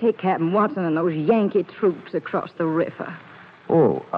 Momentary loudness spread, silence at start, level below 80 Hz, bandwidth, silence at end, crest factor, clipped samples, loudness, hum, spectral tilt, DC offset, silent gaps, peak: 10 LU; 0 s; -70 dBFS; 5.2 kHz; 0 s; 16 dB; under 0.1%; -22 LUFS; none; -10 dB/octave; under 0.1%; none; -6 dBFS